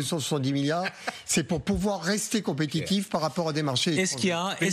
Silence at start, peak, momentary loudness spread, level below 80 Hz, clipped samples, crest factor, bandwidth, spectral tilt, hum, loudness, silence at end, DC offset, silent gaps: 0 s; -12 dBFS; 4 LU; -52 dBFS; under 0.1%; 14 dB; 14.5 kHz; -4 dB/octave; none; -27 LUFS; 0 s; under 0.1%; none